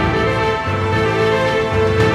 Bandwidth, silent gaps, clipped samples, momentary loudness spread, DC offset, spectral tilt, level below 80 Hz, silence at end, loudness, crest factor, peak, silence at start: 12.5 kHz; none; under 0.1%; 3 LU; under 0.1%; -6 dB/octave; -32 dBFS; 0 s; -16 LUFS; 12 dB; -4 dBFS; 0 s